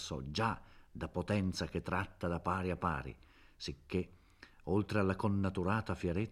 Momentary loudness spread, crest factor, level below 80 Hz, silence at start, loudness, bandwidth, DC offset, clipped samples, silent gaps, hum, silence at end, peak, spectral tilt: 12 LU; 18 dB; -56 dBFS; 0 s; -37 LUFS; 13 kHz; under 0.1%; under 0.1%; none; none; 0 s; -18 dBFS; -6.5 dB/octave